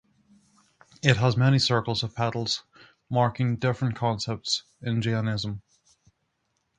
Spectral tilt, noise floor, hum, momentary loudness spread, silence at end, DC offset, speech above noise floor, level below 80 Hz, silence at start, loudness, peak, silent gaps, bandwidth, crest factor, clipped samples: -5.5 dB/octave; -75 dBFS; none; 9 LU; 1.2 s; under 0.1%; 50 dB; -56 dBFS; 1.05 s; -26 LUFS; 0 dBFS; none; 9.6 kHz; 26 dB; under 0.1%